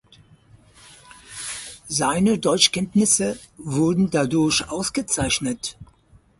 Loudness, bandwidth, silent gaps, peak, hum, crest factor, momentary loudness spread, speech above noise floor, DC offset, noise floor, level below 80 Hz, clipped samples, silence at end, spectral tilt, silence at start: -21 LUFS; 11.5 kHz; none; -2 dBFS; none; 20 dB; 14 LU; 34 dB; under 0.1%; -55 dBFS; -48 dBFS; under 0.1%; 0.55 s; -3.5 dB/octave; 1.1 s